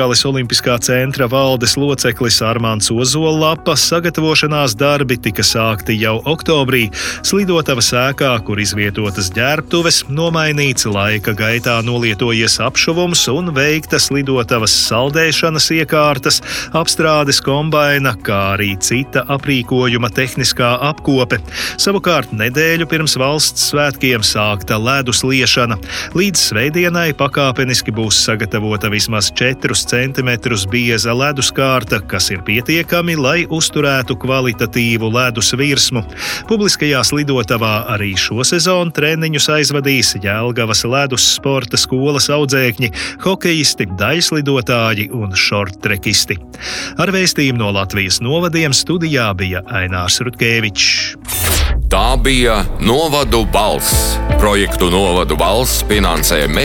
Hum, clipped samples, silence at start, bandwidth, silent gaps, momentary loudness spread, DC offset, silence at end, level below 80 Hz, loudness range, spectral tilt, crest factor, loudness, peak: none; under 0.1%; 0 s; 17.5 kHz; none; 5 LU; under 0.1%; 0 s; -28 dBFS; 2 LU; -3.5 dB/octave; 14 dB; -13 LUFS; 0 dBFS